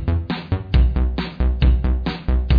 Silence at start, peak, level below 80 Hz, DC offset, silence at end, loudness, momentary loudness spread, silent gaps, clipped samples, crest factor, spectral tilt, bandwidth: 0 s; -4 dBFS; -20 dBFS; under 0.1%; 0 s; -21 LUFS; 6 LU; none; under 0.1%; 14 dB; -9 dB/octave; 5 kHz